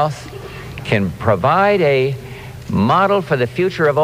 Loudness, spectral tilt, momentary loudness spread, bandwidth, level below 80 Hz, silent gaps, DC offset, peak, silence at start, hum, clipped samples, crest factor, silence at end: -16 LUFS; -7 dB/octave; 18 LU; 15.5 kHz; -44 dBFS; none; under 0.1%; -2 dBFS; 0 s; none; under 0.1%; 14 dB; 0 s